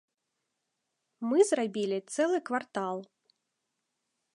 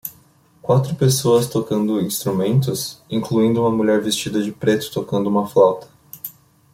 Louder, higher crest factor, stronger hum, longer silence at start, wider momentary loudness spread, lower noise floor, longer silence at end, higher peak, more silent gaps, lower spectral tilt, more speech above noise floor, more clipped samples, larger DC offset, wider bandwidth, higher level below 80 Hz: second, -30 LUFS vs -19 LUFS; about the same, 20 dB vs 16 dB; neither; first, 1.2 s vs 0.05 s; second, 11 LU vs 15 LU; first, -84 dBFS vs -53 dBFS; first, 1.3 s vs 0.45 s; second, -12 dBFS vs -2 dBFS; neither; about the same, -4.5 dB/octave vs -5.5 dB/octave; first, 54 dB vs 35 dB; neither; neither; second, 11.5 kHz vs 16.5 kHz; second, -88 dBFS vs -56 dBFS